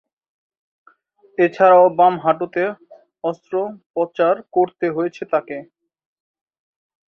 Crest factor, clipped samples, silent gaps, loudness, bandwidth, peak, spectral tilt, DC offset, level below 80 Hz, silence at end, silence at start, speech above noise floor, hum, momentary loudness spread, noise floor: 18 dB; under 0.1%; 3.86-3.94 s; -18 LUFS; 6.6 kHz; -2 dBFS; -7.5 dB/octave; under 0.1%; -70 dBFS; 1.45 s; 1.4 s; 37 dB; none; 15 LU; -54 dBFS